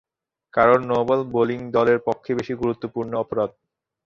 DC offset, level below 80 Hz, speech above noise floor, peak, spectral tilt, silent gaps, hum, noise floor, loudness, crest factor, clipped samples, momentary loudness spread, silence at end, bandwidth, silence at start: under 0.1%; -56 dBFS; 37 dB; -2 dBFS; -7.5 dB/octave; none; none; -58 dBFS; -22 LUFS; 20 dB; under 0.1%; 10 LU; 0.55 s; 7.2 kHz; 0.55 s